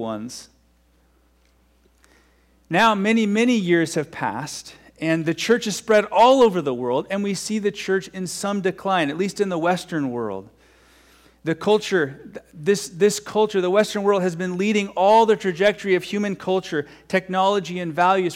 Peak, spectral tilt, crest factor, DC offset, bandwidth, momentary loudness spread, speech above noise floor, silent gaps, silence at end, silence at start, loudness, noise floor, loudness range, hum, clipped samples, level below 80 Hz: -6 dBFS; -5 dB/octave; 16 dB; under 0.1%; 16 kHz; 12 LU; 39 dB; none; 0 s; 0 s; -21 LUFS; -59 dBFS; 5 LU; none; under 0.1%; -60 dBFS